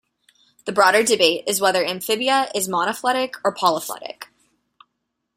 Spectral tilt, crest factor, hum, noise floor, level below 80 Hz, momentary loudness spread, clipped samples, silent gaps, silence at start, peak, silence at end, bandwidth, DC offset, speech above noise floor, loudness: -2 dB/octave; 20 dB; none; -77 dBFS; -66 dBFS; 16 LU; under 0.1%; none; 0.65 s; 0 dBFS; 1.15 s; 16 kHz; under 0.1%; 57 dB; -19 LUFS